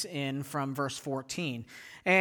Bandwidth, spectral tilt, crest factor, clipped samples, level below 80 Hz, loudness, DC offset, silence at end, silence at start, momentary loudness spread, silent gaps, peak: over 20 kHz; -4.5 dB/octave; 20 dB; under 0.1%; -72 dBFS; -34 LUFS; under 0.1%; 0 s; 0 s; 6 LU; none; -12 dBFS